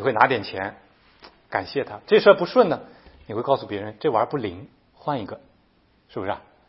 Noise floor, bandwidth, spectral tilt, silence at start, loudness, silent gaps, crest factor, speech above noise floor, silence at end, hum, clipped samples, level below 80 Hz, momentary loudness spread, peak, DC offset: -61 dBFS; 5.8 kHz; -9 dB/octave; 0 s; -23 LUFS; none; 24 dB; 39 dB; 0.3 s; none; under 0.1%; -62 dBFS; 17 LU; 0 dBFS; under 0.1%